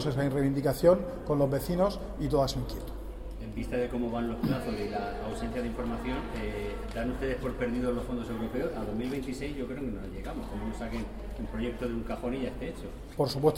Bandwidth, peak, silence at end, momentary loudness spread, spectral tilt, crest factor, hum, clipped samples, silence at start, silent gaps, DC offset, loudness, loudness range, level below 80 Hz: 16 kHz; -10 dBFS; 0 s; 11 LU; -7 dB/octave; 20 dB; none; under 0.1%; 0 s; none; under 0.1%; -32 LUFS; 7 LU; -42 dBFS